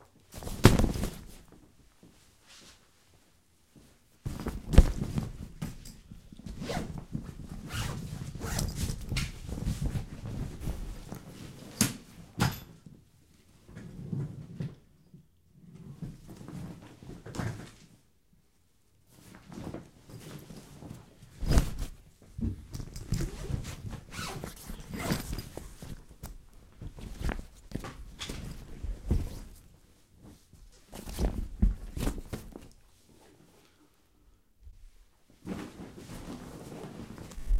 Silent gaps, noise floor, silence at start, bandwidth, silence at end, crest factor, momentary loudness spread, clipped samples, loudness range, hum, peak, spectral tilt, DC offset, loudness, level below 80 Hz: none; -69 dBFS; 0 s; 16 kHz; 0 s; 34 dB; 22 LU; under 0.1%; 13 LU; none; -2 dBFS; -5.5 dB/octave; under 0.1%; -36 LUFS; -38 dBFS